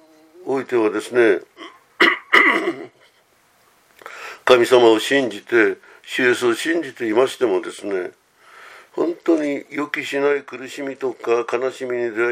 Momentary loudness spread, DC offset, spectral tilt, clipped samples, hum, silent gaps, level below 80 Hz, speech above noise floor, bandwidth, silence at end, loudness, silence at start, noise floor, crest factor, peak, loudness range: 16 LU; under 0.1%; -3.5 dB/octave; under 0.1%; none; none; -70 dBFS; 39 dB; 15.5 kHz; 0 s; -19 LUFS; 0.4 s; -58 dBFS; 20 dB; 0 dBFS; 6 LU